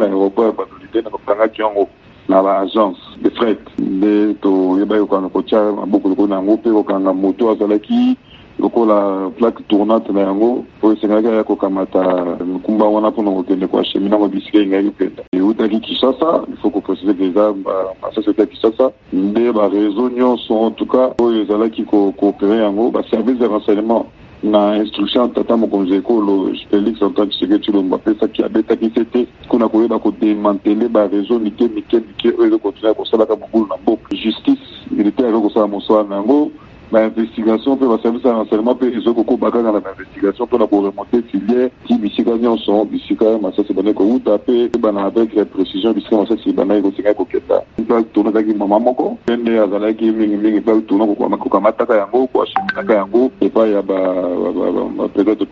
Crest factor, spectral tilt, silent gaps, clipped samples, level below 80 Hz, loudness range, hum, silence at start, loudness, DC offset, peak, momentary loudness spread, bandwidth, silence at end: 14 dB; -5 dB/octave; 15.28-15.32 s; under 0.1%; -52 dBFS; 1 LU; none; 0 s; -15 LUFS; under 0.1%; 0 dBFS; 4 LU; 5.6 kHz; 0.05 s